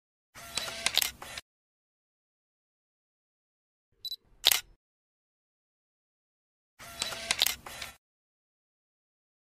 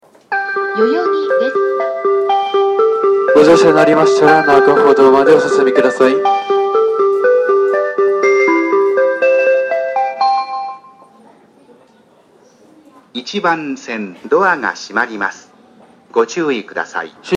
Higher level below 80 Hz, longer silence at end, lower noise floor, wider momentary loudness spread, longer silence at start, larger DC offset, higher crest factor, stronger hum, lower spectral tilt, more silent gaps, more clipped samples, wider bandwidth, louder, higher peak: about the same, -64 dBFS vs -60 dBFS; first, 1.6 s vs 0 s; first, under -90 dBFS vs -49 dBFS; first, 19 LU vs 13 LU; about the same, 0.35 s vs 0.3 s; neither; first, 34 dB vs 14 dB; neither; second, 1 dB/octave vs -5 dB/octave; first, 1.42-3.92 s, 4.76-6.77 s vs none; neither; first, 15.5 kHz vs 9.6 kHz; second, -29 LUFS vs -13 LUFS; second, -4 dBFS vs 0 dBFS